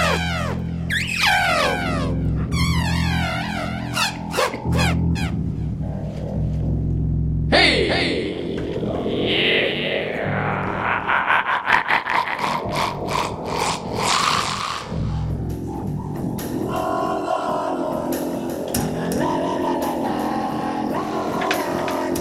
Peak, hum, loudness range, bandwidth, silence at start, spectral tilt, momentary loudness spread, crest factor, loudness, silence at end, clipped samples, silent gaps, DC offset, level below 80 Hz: 0 dBFS; none; 4 LU; 16 kHz; 0 s; -4.5 dB/octave; 9 LU; 22 dB; -21 LUFS; 0 s; under 0.1%; none; under 0.1%; -34 dBFS